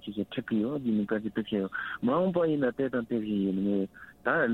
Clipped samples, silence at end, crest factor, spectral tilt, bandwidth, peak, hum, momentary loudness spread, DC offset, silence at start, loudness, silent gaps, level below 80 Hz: under 0.1%; 0 s; 16 dB; -8.5 dB/octave; 4.2 kHz; -12 dBFS; none; 7 LU; under 0.1%; 0 s; -30 LUFS; none; -64 dBFS